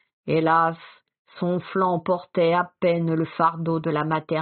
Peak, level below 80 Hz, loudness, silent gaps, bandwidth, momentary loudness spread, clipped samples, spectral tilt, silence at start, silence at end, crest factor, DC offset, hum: -6 dBFS; -66 dBFS; -23 LUFS; 1.19-1.25 s; 4.5 kHz; 6 LU; under 0.1%; -5.5 dB/octave; 0.25 s; 0 s; 16 dB; under 0.1%; none